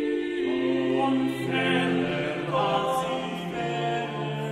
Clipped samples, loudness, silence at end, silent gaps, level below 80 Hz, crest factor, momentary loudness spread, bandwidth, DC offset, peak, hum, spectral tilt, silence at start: under 0.1%; -26 LUFS; 0 s; none; -62 dBFS; 14 dB; 6 LU; 14.5 kHz; under 0.1%; -12 dBFS; none; -6 dB/octave; 0 s